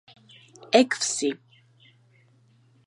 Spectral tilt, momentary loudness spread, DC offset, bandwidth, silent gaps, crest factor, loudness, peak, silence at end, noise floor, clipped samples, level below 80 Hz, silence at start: -2 dB/octave; 11 LU; under 0.1%; 11.5 kHz; none; 24 dB; -23 LUFS; -4 dBFS; 1.5 s; -60 dBFS; under 0.1%; -84 dBFS; 0.7 s